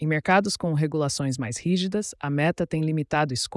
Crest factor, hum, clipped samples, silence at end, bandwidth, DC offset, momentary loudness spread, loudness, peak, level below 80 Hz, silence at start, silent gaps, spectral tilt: 16 dB; none; under 0.1%; 0 s; 12 kHz; under 0.1%; 7 LU; -25 LUFS; -10 dBFS; -58 dBFS; 0 s; none; -5 dB/octave